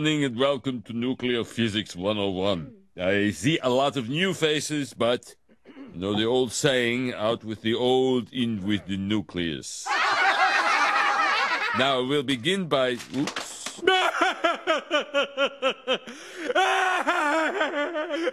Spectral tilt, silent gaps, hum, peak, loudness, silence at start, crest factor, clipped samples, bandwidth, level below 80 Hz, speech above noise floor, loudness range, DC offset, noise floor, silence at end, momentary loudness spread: -4 dB/octave; none; none; -6 dBFS; -25 LUFS; 0 s; 20 dB; under 0.1%; 14 kHz; -58 dBFS; 22 dB; 4 LU; under 0.1%; -47 dBFS; 0 s; 9 LU